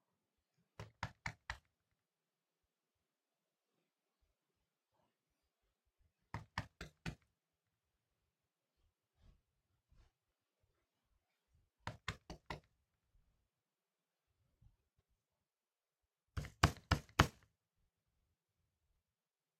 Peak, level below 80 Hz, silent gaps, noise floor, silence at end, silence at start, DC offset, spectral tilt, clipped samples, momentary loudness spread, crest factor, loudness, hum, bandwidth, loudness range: -10 dBFS; -60 dBFS; none; under -90 dBFS; 2.3 s; 0.8 s; under 0.1%; -4.5 dB/octave; under 0.1%; 18 LU; 38 dB; -42 LUFS; none; 15 kHz; 19 LU